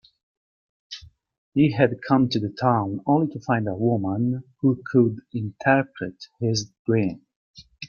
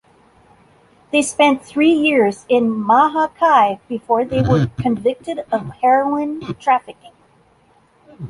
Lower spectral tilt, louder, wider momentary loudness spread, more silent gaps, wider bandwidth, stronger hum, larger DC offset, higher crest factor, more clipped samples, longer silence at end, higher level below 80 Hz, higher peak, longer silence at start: about the same, -6.5 dB/octave vs -5.5 dB/octave; second, -23 LUFS vs -16 LUFS; first, 13 LU vs 9 LU; first, 1.38-1.52 s, 6.79-6.85 s, 7.36-7.54 s vs none; second, 7 kHz vs 11.5 kHz; neither; neither; about the same, 20 dB vs 16 dB; neither; about the same, 0 s vs 0 s; second, -60 dBFS vs -48 dBFS; about the same, -4 dBFS vs -2 dBFS; second, 0.9 s vs 1.15 s